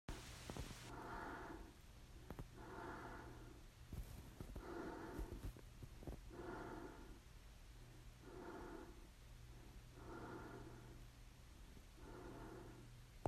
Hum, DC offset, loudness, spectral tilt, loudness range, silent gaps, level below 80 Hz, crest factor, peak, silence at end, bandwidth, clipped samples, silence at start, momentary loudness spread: none; under 0.1%; -57 LUFS; -5.5 dB/octave; 4 LU; none; -60 dBFS; 28 dB; -26 dBFS; 0 s; 15.5 kHz; under 0.1%; 0.1 s; 11 LU